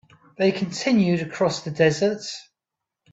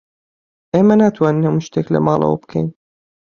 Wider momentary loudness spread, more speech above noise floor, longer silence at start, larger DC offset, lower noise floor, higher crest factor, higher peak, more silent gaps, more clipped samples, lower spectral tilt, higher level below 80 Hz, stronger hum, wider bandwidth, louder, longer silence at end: about the same, 11 LU vs 10 LU; second, 64 dB vs over 75 dB; second, 0.4 s vs 0.75 s; neither; second, -86 dBFS vs under -90 dBFS; about the same, 18 dB vs 16 dB; second, -6 dBFS vs -2 dBFS; neither; neither; second, -5.5 dB/octave vs -8.5 dB/octave; second, -64 dBFS vs -52 dBFS; neither; first, 8 kHz vs 7 kHz; second, -22 LUFS vs -16 LUFS; about the same, 0.7 s vs 0.65 s